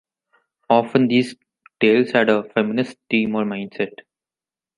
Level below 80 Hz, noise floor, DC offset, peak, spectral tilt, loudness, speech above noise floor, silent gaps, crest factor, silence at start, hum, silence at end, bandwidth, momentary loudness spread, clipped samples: -66 dBFS; under -90 dBFS; under 0.1%; -2 dBFS; -6.5 dB/octave; -19 LUFS; over 71 dB; none; 18 dB; 0.7 s; none; 0.9 s; 11 kHz; 10 LU; under 0.1%